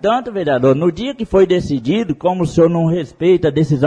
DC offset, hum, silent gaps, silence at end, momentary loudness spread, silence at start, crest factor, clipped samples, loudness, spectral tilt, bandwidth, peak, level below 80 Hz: under 0.1%; none; none; 0 s; 5 LU; 0 s; 12 dB; under 0.1%; -15 LUFS; -7.5 dB/octave; 10 kHz; -2 dBFS; -42 dBFS